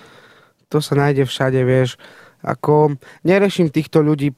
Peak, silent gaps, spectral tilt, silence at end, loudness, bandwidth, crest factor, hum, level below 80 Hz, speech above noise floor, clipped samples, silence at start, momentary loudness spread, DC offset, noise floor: -2 dBFS; none; -7 dB/octave; 0.05 s; -17 LUFS; 15 kHz; 16 dB; none; -52 dBFS; 34 dB; under 0.1%; 0.7 s; 8 LU; under 0.1%; -50 dBFS